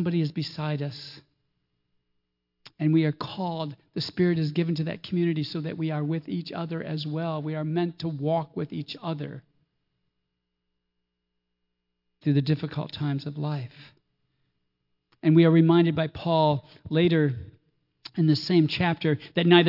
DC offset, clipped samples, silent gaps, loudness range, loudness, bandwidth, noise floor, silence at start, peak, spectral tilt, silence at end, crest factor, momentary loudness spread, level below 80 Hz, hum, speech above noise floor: under 0.1%; under 0.1%; none; 10 LU; -26 LUFS; 5.8 kHz; -81 dBFS; 0 s; -6 dBFS; -8.5 dB/octave; 0 s; 20 dB; 12 LU; -64 dBFS; 60 Hz at -55 dBFS; 56 dB